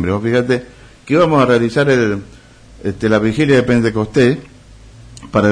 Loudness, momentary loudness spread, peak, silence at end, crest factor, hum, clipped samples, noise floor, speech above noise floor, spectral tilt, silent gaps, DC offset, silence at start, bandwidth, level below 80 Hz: -14 LUFS; 8 LU; -2 dBFS; 0 s; 14 dB; none; under 0.1%; -39 dBFS; 26 dB; -7 dB/octave; none; under 0.1%; 0 s; 10.5 kHz; -42 dBFS